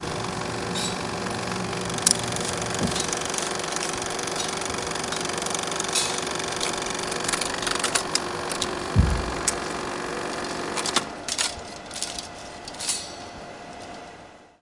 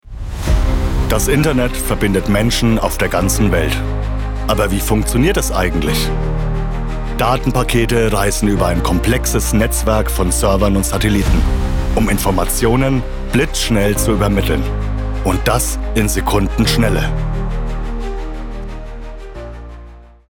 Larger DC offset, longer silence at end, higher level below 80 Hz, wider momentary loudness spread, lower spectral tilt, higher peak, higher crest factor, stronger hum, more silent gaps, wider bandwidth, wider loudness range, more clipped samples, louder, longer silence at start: neither; about the same, 0.15 s vs 0.25 s; second, -40 dBFS vs -20 dBFS; about the same, 13 LU vs 11 LU; second, -2.5 dB/octave vs -5 dB/octave; about the same, 0 dBFS vs -2 dBFS; first, 28 dB vs 12 dB; neither; neither; second, 11.5 kHz vs 18.5 kHz; about the same, 4 LU vs 3 LU; neither; second, -26 LUFS vs -16 LUFS; about the same, 0 s vs 0.05 s